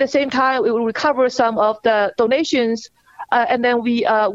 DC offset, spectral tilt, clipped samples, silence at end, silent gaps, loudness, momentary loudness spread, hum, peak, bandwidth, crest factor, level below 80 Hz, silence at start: under 0.1%; -4 dB/octave; under 0.1%; 0 s; none; -17 LUFS; 3 LU; none; -2 dBFS; 7.8 kHz; 14 dB; -60 dBFS; 0 s